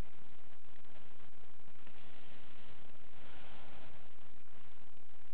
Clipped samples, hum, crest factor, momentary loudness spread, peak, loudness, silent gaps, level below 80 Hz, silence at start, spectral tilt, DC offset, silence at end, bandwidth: under 0.1%; none; 18 dB; 7 LU; -26 dBFS; -61 LUFS; none; -70 dBFS; 0 s; -7 dB/octave; 4%; 0 s; 4 kHz